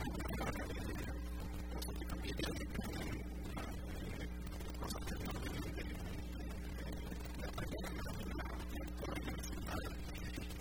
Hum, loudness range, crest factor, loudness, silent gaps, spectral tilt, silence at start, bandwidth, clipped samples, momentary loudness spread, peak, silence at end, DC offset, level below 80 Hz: none; 2 LU; 16 dB; -45 LUFS; none; -5 dB/octave; 0 s; 17.5 kHz; under 0.1%; 5 LU; -28 dBFS; 0 s; 0.1%; -46 dBFS